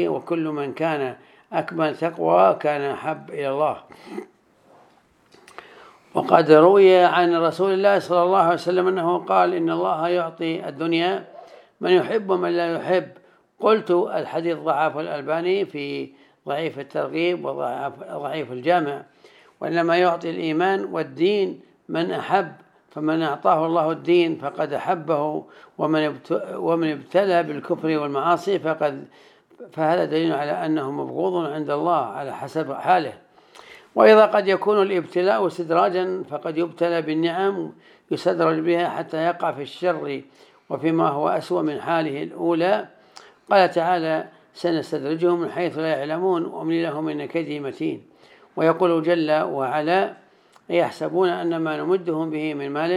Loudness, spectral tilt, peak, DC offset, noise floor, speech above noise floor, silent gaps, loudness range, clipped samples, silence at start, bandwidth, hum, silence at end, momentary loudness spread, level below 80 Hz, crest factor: -22 LUFS; -7 dB/octave; 0 dBFS; under 0.1%; -57 dBFS; 36 dB; none; 6 LU; under 0.1%; 0 s; 12 kHz; none; 0 s; 11 LU; -78 dBFS; 22 dB